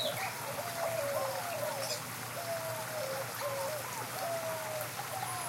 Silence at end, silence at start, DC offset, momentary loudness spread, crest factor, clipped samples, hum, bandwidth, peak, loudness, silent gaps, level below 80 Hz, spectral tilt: 0 s; 0 s; under 0.1%; 3 LU; 16 dB; under 0.1%; none; 16.5 kHz; -22 dBFS; -37 LUFS; none; -76 dBFS; -2.5 dB/octave